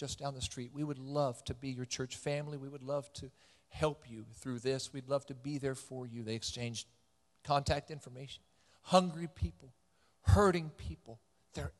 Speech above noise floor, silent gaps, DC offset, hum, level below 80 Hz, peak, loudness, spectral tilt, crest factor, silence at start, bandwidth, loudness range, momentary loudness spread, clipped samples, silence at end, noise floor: 36 dB; none; under 0.1%; none; -48 dBFS; -12 dBFS; -37 LUFS; -5.5 dB/octave; 26 dB; 0 s; 12.5 kHz; 6 LU; 19 LU; under 0.1%; 0.1 s; -72 dBFS